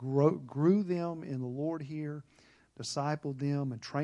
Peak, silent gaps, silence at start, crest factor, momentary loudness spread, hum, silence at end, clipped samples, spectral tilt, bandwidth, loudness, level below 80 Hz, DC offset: -14 dBFS; none; 0 s; 20 dB; 11 LU; none; 0 s; under 0.1%; -7 dB/octave; 11 kHz; -33 LUFS; -76 dBFS; under 0.1%